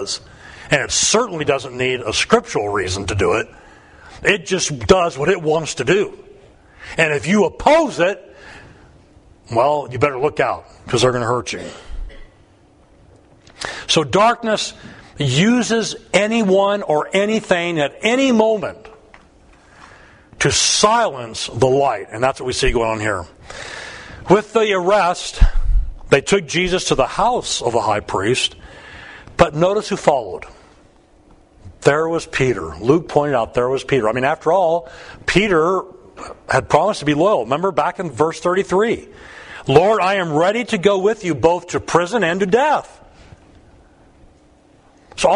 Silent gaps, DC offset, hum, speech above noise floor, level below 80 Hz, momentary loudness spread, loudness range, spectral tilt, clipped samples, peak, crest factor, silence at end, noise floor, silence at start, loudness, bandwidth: none; under 0.1%; none; 34 dB; -32 dBFS; 14 LU; 4 LU; -4 dB/octave; under 0.1%; 0 dBFS; 18 dB; 0 s; -51 dBFS; 0 s; -17 LUFS; 11 kHz